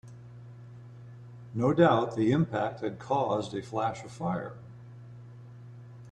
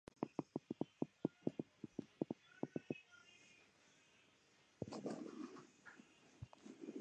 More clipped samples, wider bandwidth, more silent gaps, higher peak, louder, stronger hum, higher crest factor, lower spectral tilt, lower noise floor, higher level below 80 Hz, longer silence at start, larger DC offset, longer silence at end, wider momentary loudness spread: neither; about the same, 9.8 kHz vs 9.4 kHz; neither; first, -8 dBFS vs -24 dBFS; first, -29 LUFS vs -50 LUFS; first, 60 Hz at -45 dBFS vs none; about the same, 22 dB vs 26 dB; about the same, -7.5 dB/octave vs -7 dB/octave; second, -47 dBFS vs -74 dBFS; first, -64 dBFS vs -80 dBFS; second, 0.05 s vs 0.2 s; neither; about the same, 0 s vs 0 s; first, 25 LU vs 19 LU